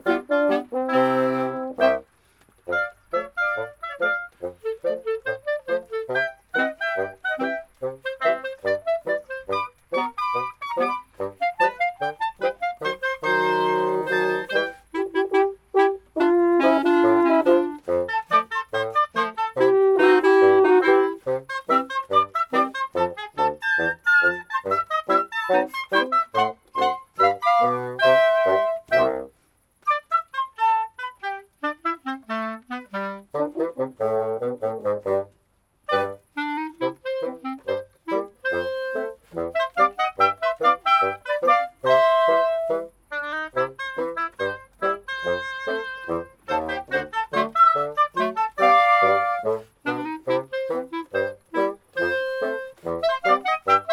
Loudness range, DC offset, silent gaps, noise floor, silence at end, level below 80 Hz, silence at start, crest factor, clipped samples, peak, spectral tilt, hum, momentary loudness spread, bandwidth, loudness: 8 LU; under 0.1%; none; -65 dBFS; 0 s; -62 dBFS; 0.05 s; 18 dB; under 0.1%; -4 dBFS; -5.5 dB/octave; none; 12 LU; 13.5 kHz; -23 LUFS